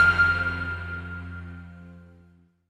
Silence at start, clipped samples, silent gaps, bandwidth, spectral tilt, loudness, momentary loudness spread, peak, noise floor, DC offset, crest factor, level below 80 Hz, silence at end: 0 s; under 0.1%; none; 10.5 kHz; -5.5 dB/octave; -25 LUFS; 23 LU; -8 dBFS; -57 dBFS; under 0.1%; 18 dB; -46 dBFS; 0.65 s